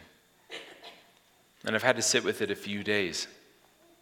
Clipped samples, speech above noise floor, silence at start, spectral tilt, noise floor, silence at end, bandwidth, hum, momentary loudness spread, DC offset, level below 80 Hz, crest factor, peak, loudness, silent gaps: under 0.1%; 34 dB; 0 s; -2 dB/octave; -64 dBFS; 0.65 s; 19 kHz; none; 21 LU; under 0.1%; -74 dBFS; 28 dB; -6 dBFS; -29 LUFS; none